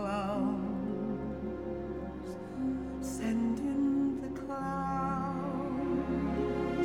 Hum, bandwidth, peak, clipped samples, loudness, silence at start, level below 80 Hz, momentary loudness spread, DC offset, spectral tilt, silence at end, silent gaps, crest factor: none; 14.5 kHz; -20 dBFS; under 0.1%; -34 LUFS; 0 s; -50 dBFS; 7 LU; 0.1%; -7.5 dB/octave; 0 s; none; 12 dB